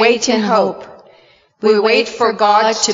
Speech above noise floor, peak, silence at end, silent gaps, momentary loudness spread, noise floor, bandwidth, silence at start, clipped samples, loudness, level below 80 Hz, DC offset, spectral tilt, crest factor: 36 dB; 0 dBFS; 0 s; none; 7 LU; -50 dBFS; 7.6 kHz; 0 s; under 0.1%; -14 LUFS; -60 dBFS; under 0.1%; -3 dB/octave; 14 dB